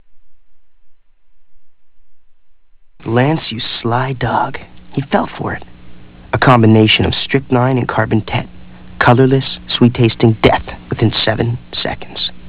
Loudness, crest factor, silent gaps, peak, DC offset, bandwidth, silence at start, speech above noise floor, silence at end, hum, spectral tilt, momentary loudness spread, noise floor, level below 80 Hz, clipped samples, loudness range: -14 LUFS; 16 dB; none; 0 dBFS; 2%; 4 kHz; 0 s; 29 dB; 0 s; none; -10.5 dB/octave; 13 LU; -42 dBFS; -38 dBFS; 0.2%; 7 LU